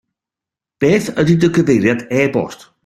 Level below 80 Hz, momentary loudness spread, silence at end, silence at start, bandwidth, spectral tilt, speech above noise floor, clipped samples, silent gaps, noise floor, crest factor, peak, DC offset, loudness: -50 dBFS; 6 LU; 0.3 s; 0.8 s; 14 kHz; -6.5 dB/octave; 73 dB; under 0.1%; none; -87 dBFS; 14 dB; 0 dBFS; under 0.1%; -15 LUFS